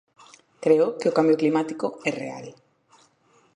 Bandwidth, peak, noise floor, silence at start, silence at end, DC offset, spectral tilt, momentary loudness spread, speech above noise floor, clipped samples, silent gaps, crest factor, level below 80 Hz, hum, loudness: 10.5 kHz; -4 dBFS; -61 dBFS; 0.6 s; 1.05 s; under 0.1%; -6.5 dB/octave; 15 LU; 39 dB; under 0.1%; none; 20 dB; -76 dBFS; none; -23 LUFS